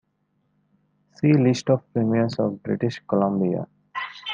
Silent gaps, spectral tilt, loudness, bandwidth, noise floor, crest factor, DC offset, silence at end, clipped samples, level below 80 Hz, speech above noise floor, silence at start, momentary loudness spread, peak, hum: none; -7 dB/octave; -23 LUFS; 9 kHz; -70 dBFS; 18 dB; under 0.1%; 0 s; under 0.1%; -66 dBFS; 49 dB; 1.2 s; 12 LU; -6 dBFS; none